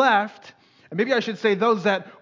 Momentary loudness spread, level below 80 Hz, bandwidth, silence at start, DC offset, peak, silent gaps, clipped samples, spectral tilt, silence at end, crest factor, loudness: 10 LU; -78 dBFS; 7.6 kHz; 0 s; under 0.1%; -6 dBFS; none; under 0.1%; -5.5 dB/octave; 0.1 s; 16 dB; -22 LUFS